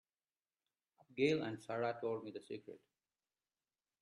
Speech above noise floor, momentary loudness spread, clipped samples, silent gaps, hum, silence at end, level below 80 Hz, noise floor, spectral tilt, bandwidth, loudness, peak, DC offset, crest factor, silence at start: over 50 dB; 16 LU; under 0.1%; none; none; 1.25 s; -84 dBFS; under -90 dBFS; -6 dB/octave; 11.5 kHz; -40 LUFS; -22 dBFS; under 0.1%; 22 dB; 1.15 s